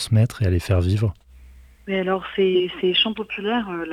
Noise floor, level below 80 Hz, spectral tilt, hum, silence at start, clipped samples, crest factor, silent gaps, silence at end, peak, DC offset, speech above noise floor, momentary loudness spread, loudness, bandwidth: -46 dBFS; -46 dBFS; -6 dB/octave; none; 0 s; under 0.1%; 14 dB; none; 0 s; -6 dBFS; under 0.1%; 26 dB; 7 LU; -21 LUFS; 13.5 kHz